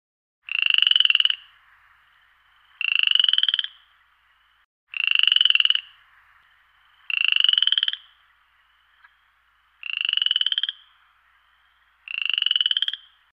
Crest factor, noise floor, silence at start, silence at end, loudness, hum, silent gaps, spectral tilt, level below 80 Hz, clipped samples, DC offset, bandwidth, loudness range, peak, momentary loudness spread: 22 dB; -63 dBFS; 0.5 s; 0.35 s; -19 LUFS; 60 Hz at -80 dBFS; 4.65-4.87 s; 5 dB/octave; -76 dBFS; under 0.1%; under 0.1%; 9.8 kHz; 7 LU; -2 dBFS; 13 LU